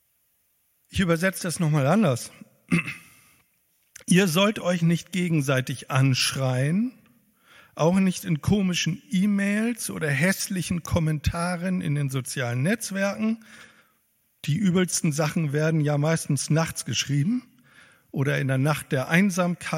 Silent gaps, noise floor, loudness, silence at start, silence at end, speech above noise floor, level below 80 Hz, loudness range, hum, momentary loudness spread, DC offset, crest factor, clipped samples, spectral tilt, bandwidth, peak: none; -69 dBFS; -24 LUFS; 0.9 s; 0 s; 45 dB; -50 dBFS; 3 LU; none; 7 LU; under 0.1%; 22 dB; under 0.1%; -5 dB/octave; 16.5 kHz; -4 dBFS